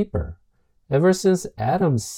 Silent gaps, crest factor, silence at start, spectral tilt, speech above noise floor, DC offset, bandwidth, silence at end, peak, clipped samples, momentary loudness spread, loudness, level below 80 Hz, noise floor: none; 14 dB; 0 s; -6.5 dB/octave; 42 dB; under 0.1%; 16.5 kHz; 0 s; -8 dBFS; under 0.1%; 11 LU; -21 LUFS; -42 dBFS; -62 dBFS